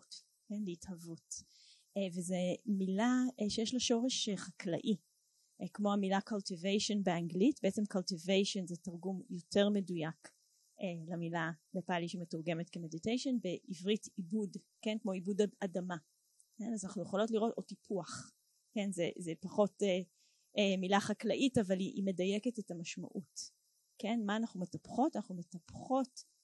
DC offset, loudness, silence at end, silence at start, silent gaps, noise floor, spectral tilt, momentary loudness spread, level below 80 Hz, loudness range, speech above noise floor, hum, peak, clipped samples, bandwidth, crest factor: under 0.1%; -37 LUFS; 0.2 s; 0.1 s; none; -75 dBFS; -5 dB/octave; 14 LU; -76 dBFS; 5 LU; 38 dB; none; -16 dBFS; under 0.1%; 12 kHz; 22 dB